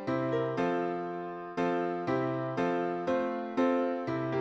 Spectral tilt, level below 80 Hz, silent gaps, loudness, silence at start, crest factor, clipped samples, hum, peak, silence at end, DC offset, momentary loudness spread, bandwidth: -8 dB/octave; -70 dBFS; none; -32 LUFS; 0 s; 14 dB; under 0.1%; none; -16 dBFS; 0 s; under 0.1%; 5 LU; 8 kHz